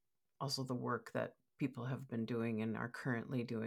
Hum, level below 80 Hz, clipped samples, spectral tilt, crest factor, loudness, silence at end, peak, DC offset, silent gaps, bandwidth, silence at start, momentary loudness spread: none; -84 dBFS; under 0.1%; -6 dB/octave; 16 dB; -42 LUFS; 0 s; -26 dBFS; under 0.1%; none; 15.5 kHz; 0.4 s; 4 LU